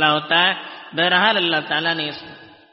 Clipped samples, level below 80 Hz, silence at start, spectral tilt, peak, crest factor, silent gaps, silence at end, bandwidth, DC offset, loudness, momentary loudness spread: under 0.1%; -68 dBFS; 0 s; 0 dB/octave; -2 dBFS; 18 dB; none; 0.25 s; 5.8 kHz; under 0.1%; -18 LUFS; 13 LU